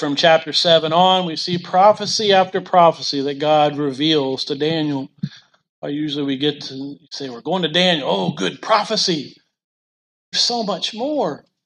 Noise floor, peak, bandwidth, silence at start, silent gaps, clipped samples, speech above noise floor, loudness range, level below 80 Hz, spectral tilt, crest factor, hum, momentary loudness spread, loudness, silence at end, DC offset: under -90 dBFS; 0 dBFS; 11 kHz; 0 s; 5.69-5.82 s, 9.64-10.32 s; under 0.1%; over 72 dB; 7 LU; -68 dBFS; -4 dB/octave; 18 dB; none; 15 LU; -17 LUFS; 0.3 s; under 0.1%